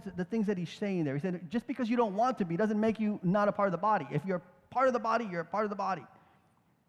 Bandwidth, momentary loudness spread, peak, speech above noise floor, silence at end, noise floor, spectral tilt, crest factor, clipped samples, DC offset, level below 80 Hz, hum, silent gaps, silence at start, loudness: 10 kHz; 7 LU; -16 dBFS; 38 dB; 0.8 s; -69 dBFS; -7.5 dB/octave; 16 dB; under 0.1%; under 0.1%; -70 dBFS; none; none; 0 s; -32 LUFS